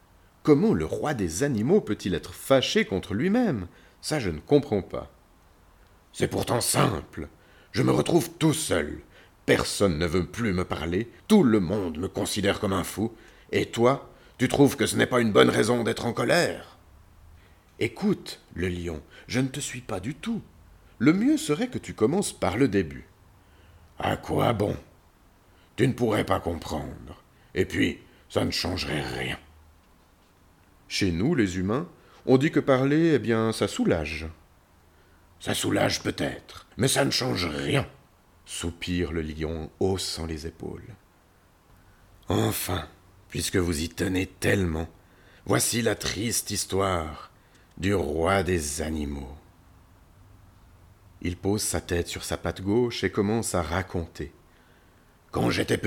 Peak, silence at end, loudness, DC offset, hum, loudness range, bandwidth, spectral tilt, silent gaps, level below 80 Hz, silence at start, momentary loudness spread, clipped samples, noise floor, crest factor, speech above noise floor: -4 dBFS; 0 s; -26 LUFS; under 0.1%; none; 7 LU; 19 kHz; -5 dB/octave; none; -48 dBFS; 0.45 s; 14 LU; under 0.1%; -59 dBFS; 24 dB; 34 dB